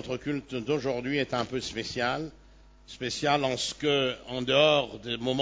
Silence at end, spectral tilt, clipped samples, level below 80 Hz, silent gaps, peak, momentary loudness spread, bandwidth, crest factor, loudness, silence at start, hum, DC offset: 0 s; -4 dB/octave; under 0.1%; -56 dBFS; none; -8 dBFS; 11 LU; 8 kHz; 22 dB; -28 LUFS; 0 s; none; under 0.1%